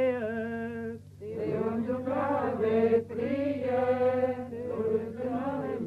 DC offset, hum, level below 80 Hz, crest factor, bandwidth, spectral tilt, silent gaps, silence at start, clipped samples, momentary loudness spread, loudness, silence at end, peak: under 0.1%; 50 Hz at -65 dBFS; -62 dBFS; 14 dB; 8 kHz; -8.5 dB/octave; none; 0 s; under 0.1%; 9 LU; -30 LUFS; 0 s; -16 dBFS